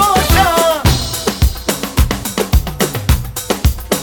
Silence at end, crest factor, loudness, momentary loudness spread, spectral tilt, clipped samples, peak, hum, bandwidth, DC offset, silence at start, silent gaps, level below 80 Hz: 0 s; 14 dB; -15 LUFS; 7 LU; -4 dB/octave; under 0.1%; 0 dBFS; none; 19.5 kHz; under 0.1%; 0 s; none; -18 dBFS